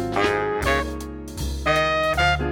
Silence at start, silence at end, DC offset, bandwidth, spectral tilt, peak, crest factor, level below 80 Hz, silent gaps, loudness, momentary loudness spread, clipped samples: 0 s; 0 s; under 0.1%; 17.5 kHz; -4.5 dB/octave; -6 dBFS; 16 dB; -32 dBFS; none; -22 LUFS; 11 LU; under 0.1%